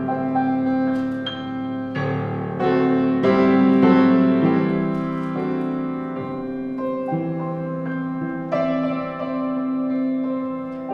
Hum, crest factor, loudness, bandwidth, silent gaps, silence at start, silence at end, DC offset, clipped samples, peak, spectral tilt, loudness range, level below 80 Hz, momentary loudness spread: none; 18 dB; -21 LUFS; 5.2 kHz; none; 0 s; 0 s; under 0.1%; under 0.1%; -4 dBFS; -9 dB/octave; 8 LU; -56 dBFS; 12 LU